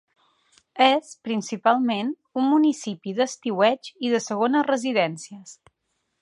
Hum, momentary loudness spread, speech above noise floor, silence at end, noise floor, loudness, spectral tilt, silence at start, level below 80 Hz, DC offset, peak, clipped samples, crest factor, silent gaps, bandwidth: none; 10 LU; 53 dB; 0.7 s; -76 dBFS; -23 LUFS; -4 dB/octave; 0.75 s; -78 dBFS; under 0.1%; -4 dBFS; under 0.1%; 20 dB; none; 11.5 kHz